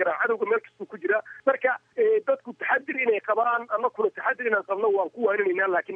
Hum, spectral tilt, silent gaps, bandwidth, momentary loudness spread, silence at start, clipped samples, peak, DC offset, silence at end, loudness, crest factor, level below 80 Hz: none; -6.5 dB/octave; none; 3.7 kHz; 4 LU; 0 s; under 0.1%; -8 dBFS; under 0.1%; 0 s; -25 LUFS; 18 dB; -86 dBFS